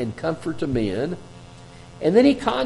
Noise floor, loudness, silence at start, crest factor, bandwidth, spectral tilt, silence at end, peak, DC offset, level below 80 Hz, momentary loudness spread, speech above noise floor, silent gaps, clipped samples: -43 dBFS; -22 LUFS; 0 s; 18 dB; 11.5 kHz; -7 dB/octave; 0 s; -4 dBFS; under 0.1%; -48 dBFS; 11 LU; 22 dB; none; under 0.1%